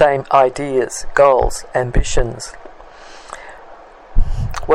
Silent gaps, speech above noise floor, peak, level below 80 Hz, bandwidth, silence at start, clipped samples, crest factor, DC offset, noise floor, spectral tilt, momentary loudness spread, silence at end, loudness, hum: none; 24 dB; 0 dBFS; -22 dBFS; 12 kHz; 0 s; under 0.1%; 16 dB; under 0.1%; -39 dBFS; -5 dB/octave; 23 LU; 0 s; -17 LUFS; none